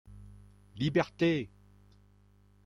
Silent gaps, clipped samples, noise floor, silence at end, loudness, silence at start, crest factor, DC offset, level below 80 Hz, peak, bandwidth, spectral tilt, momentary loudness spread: none; under 0.1%; -63 dBFS; 1.2 s; -31 LUFS; 0.05 s; 20 dB; under 0.1%; -60 dBFS; -14 dBFS; 11 kHz; -7 dB/octave; 25 LU